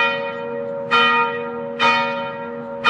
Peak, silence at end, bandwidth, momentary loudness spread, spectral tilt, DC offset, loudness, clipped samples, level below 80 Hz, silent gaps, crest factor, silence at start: -4 dBFS; 0 s; 10.5 kHz; 13 LU; -4 dB/octave; under 0.1%; -19 LUFS; under 0.1%; -66 dBFS; none; 16 dB; 0 s